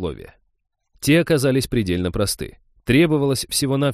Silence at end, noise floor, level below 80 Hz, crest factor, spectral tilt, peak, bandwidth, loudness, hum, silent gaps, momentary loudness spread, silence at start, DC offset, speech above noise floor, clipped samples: 0 s; -71 dBFS; -42 dBFS; 18 dB; -5 dB/octave; -4 dBFS; 15.5 kHz; -19 LUFS; none; none; 14 LU; 0 s; under 0.1%; 51 dB; under 0.1%